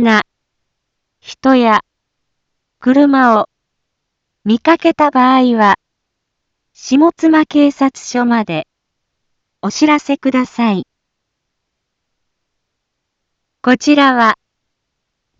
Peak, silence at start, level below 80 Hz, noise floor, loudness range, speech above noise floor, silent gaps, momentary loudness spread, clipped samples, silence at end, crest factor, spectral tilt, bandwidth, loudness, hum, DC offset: 0 dBFS; 0 s; -58 dBFS; -74 dBFS; 6 LU; 63 dB; none; 11 LU; under 0.1%; 1.05 s; 14 dB; -5 dB/octave; 7.8 kHz; -12 LUFS; none; under 0.1%